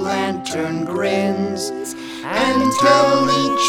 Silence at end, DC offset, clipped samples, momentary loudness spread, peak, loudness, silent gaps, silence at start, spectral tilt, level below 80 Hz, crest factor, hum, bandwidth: 0 s; under 0.1%; under 0.1%; 12 LU; 0 dBFS; -18 LUFS; none; 0 s; -4 dB/octave; -58 dBFS; 16 dB; none; 17.5 kHz